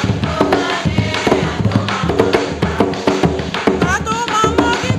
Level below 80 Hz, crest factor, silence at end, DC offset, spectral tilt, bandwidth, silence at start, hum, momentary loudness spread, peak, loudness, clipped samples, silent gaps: -32 dBFS; 16 dB; 0 s; under 0.1%; -5.5 dB/octave; 14 kHz; 0 s; none; 3 LU; 0 dBFS; -16 LUFS; under 0.1%; none